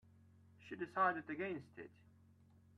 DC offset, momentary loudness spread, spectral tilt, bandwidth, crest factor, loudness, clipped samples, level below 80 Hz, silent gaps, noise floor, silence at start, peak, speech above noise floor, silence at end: under 0.1%; 21 LU; -7 dB/octave; 11 kHz; 22 dB; -41 LUFS; under 0.1%; -84 dBFS; none; -68 dBFS; 0.6 s; -22 dBFS; 26 dB; 0.9 s